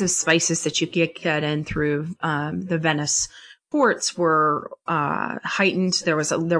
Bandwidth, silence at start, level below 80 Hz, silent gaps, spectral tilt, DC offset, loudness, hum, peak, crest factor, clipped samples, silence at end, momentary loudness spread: 10.5 kHz; 0 s; -52 dBFS; none; -3.5 dB/octave; under 0.1%; -22 LUFS; none; -4 dBFS; 18 dB; under 0.1%; 0 s; 7 LU